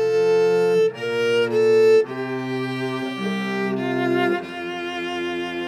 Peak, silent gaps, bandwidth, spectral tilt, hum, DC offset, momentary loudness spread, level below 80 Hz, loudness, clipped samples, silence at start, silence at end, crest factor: -8 dBFS; none; 12 kHz; -6 dB/octave; none; under 0.1%; 10 LU; -68 dBFS; -21 LUFS; under 0.1%; 0 s; 0 s; 12 dB